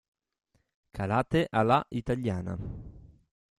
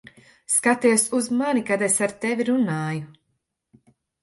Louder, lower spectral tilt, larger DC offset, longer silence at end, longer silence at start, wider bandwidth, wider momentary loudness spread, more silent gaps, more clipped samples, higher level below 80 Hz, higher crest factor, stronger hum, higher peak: second, -29 LUFS vs -21 LUFS; first, -7.5 dB/octave vs -4 dB/octave; neither; second, 0.6 s vs 1.1 s; first, 0.95 s vs 0.5 s; about the same, 13 kHz vs 12 kHz; first, 16 LU vs 7 LU; neither; neither; first, -52 dBFS vs -68 dBFS; about the same, 22 dB vs 18 dB; neither; second, -10 dBFS vs -6 dBFS